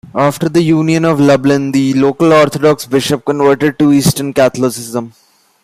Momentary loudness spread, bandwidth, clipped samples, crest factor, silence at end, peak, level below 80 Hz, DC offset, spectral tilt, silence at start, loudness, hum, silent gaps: 7 LU; 15.5 kHz; under 0.1%; 12 dB; 0.55 s; 0 dBFS; -48 dBFS; under 0.1%; -6 dB/octave; 0.15 s; -11 LUFS; none; none